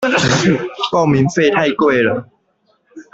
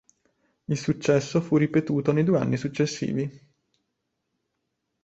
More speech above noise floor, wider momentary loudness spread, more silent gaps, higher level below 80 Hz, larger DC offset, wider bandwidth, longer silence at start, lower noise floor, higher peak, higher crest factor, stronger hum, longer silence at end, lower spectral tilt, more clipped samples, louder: second, 46 dB vs 55 dB; second, 5 LU vs 8 LU; neither; first, -48 dBFS vs -62 dBFS; neither; about the same, 8.2 kHz vs 8.2 kHz; second, 0 s vs 0.7 s; second, -61 dBFS vs -79 dBFS; first, -2 dBFS vs -8 dBFS; about the same, 14 dB vs 18 dB; neither; second, 0.1 s vs 1.65 s; second, -5 dB/octave vs -6.5 dB/octave; neither; first, -14 LUFS vs -25 LUFS